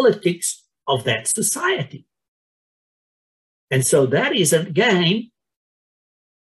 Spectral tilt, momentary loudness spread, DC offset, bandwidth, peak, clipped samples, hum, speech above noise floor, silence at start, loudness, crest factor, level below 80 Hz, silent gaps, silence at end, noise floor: -3.5 dB/octave; 9 LU; under 0.1%; 13.5 kHz; -4 dBFS; under 0.1%; none; over 71 dB; 0 s; -19 LUFS; 18 dB; -66 dBFS; 2.28-3.68 s; 1.15 s; under -90 dBFS